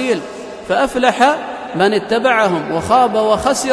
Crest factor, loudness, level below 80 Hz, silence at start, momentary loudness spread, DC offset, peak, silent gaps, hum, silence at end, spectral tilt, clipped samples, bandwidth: 14 dB; -15 LUFS; -44 dBFS; 0 s; 9 LU; under 0.1%; 0 dBFS; none; none; 0 s; -4 dB/octave; under 0.1%; 11 kHz